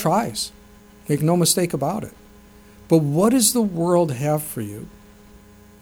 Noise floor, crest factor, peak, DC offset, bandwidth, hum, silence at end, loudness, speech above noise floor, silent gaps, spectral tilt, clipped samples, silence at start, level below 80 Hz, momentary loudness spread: -47 dBFS; 20 dB; -2 dBFS; under 0.1%; over 20 kHz; none; 0.45 s; -20 LUFS; 27 dB; none; -5 dB/octave; under 0.1%; 0 s; -52 dBFS; 16 LU